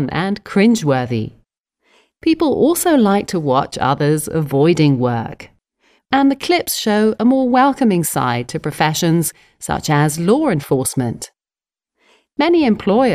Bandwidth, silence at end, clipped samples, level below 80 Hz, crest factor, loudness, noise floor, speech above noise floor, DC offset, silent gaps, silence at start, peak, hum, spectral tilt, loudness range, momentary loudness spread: 15.5 kHz; 0 s; under 0.1%; -48 dBFS; 16 dB; -16 LUFS; under -90 dBFS; over 75 dB; under 0.1%; none; 0 s; 0 dBFS; none; -5.5 dB/octave; 2 LU; 10 LU